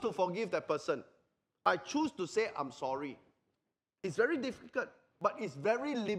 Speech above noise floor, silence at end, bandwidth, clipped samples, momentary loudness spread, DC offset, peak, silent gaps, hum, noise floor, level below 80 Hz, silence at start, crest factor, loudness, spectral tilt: 52 dB; 0 s; 11.5 kHz; under 0.1%; 8 LU; under 0.1%; -14 dBFS; none; none; -87 dBFS; -78 dBFS; 0 s; 22 dB; -36 LUFS; -5 dB/octave